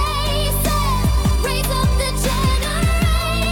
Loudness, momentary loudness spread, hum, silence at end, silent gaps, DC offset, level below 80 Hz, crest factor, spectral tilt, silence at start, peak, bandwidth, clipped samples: -18 LUFS; 1 LU; 50 Hz at -25 dBFS; 0 s; none; under 0.1%; -20 dBFS; 10 dB; -4.5 dB/octave; 0 s; -6 dBFS; 17.5 kHz; under 0.1%